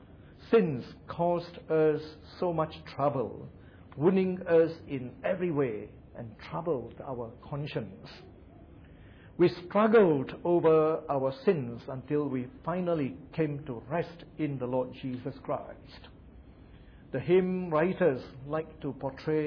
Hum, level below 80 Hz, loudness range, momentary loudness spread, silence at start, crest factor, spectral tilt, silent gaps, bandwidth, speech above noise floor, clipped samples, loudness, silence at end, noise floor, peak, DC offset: none; -58 dBFS; 10 LU; 17 LU; 0 s; 18 dB; -9.5 dB/octave; none; 5.4 kHz; 23 dB; under 0.1%; -30 LUFS; 0 s; -52 dBFS; -14 dBFS; under 0.1%